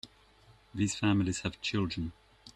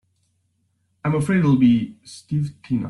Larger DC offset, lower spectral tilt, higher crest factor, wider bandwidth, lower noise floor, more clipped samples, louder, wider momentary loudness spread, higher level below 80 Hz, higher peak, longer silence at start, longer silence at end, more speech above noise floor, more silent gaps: neither; second, -5 dB/octave vs -8 dB/octave; about the same, 18 dB vs 16 dB; about the same, 11.5 kHz vs 11.5 kHz; second, -61 dBFS vs -68 dBFS; neither; second, -32 LUFS vs -20 LUFS; about the same, 14 LU vs 14 LU; about the same, -56 dBFS vs -54 dBFS; second, -16 dBFS vs -6 dBFS; second, 0.05 s vs 1.05 s; about the same, 0.05 s vs 0 s; second, 30 dB vs 49 dB; neither